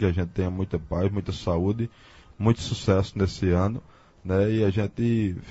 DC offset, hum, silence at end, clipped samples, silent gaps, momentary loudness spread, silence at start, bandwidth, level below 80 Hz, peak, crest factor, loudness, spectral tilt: under 0.1%; none; 0 s; under 0.1%; none; 6 LU; 0 s; 8 kHz; -44 dBFS; -6 dBFS; 20 dB; -26 LUFS; -7.5 dB/octave